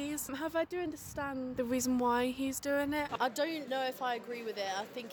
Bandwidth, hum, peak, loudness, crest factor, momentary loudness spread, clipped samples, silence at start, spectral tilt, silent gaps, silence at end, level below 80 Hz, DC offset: 19.5 kHz; none; -18 dBFS; -35 LUFS; 16 dB; 8 LU; under 0.1%; 0 s; -3.5 dB/octave; none; 0 s; -64 dBFS; under 0.1%